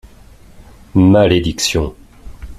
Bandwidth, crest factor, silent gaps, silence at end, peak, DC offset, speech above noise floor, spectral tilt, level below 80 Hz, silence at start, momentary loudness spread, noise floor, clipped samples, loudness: 14 kHz; 16 dB; none; 0.05 s; 0 dBFS; under 0.1%; 29 dB; -5.5 dB/octave; -34 dBFS; 0.6 s; 10 LU; -41 dBFS; under 0.1%; -14 LUFS